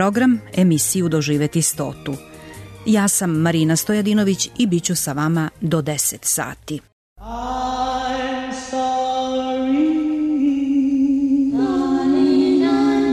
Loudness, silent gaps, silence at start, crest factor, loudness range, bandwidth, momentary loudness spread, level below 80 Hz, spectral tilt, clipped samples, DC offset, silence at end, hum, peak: -19 LUFS; 6.92-7.16 s; 0 s; 12 dB; 5 LU; 13.5 kHz; 11 LU; -46 dBFS; -5 dB/octave; under 0.1%; under 0.1%; 0 s; none; -6 dBFS